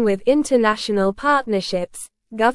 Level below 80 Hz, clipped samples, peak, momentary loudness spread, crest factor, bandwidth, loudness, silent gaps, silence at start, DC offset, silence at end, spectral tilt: -50 dBFS; under 0.1%; -4 dBFS; 13 LU; 16 dB; 12 kHz; -19 LUFS; none; 0 s; under 0.1%; 0 s; -4.5 dB/octave